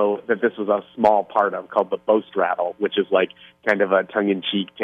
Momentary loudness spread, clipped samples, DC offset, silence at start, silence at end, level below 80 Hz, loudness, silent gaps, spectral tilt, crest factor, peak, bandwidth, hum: 5 LU; under 0.1%; under 0.1%; 0 s; 0 s; -68 dBFS; -21 LUFS; none; -7 dB/octave; 18 dB; -4 dBFS; 7.4 kHz; none